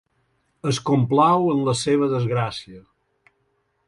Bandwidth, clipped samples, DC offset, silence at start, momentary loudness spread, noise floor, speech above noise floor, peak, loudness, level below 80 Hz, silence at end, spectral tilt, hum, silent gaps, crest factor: 11.5 kHz; under 0.1%; under 0.1%; 0.65 s; 11 LU; -69 dBFS; 49 dB; -4 dBFS; -20 LUFS; -58 dBFS; 1.05 s; -6 dB/octave; none; none; 18 dB